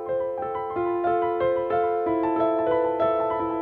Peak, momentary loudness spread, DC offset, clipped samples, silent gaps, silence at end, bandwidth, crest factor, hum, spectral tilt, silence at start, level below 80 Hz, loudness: -12 dBFS; 5 LU; under 0.1%; under 0.1%; none; 0 s; 4.3 kHz; 12 dB; none; -9 dB/octave; 0 s; -56 dBFS; -24 LUFS